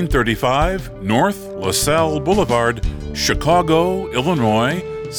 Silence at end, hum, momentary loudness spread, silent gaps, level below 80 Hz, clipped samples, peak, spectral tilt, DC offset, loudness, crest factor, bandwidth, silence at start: 0 s; none; 7 LU; none; -30 dBFS; under 0.1%; -2 dBFS; -4.5 dB/octave; under 0.1%; -17 LUFS; 14 dB; over 20 kHz; 0 s